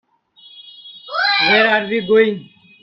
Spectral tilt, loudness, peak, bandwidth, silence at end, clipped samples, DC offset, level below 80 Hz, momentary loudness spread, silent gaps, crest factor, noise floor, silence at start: -5.5 dB/octave; -14 LUFS; 0 dBFS; 6 kHz; 0.35 s; under 0.1%; under 0.1%; -62 dBFS; 24 LU; none; 18 dB; -48 dBFS; 0.55 s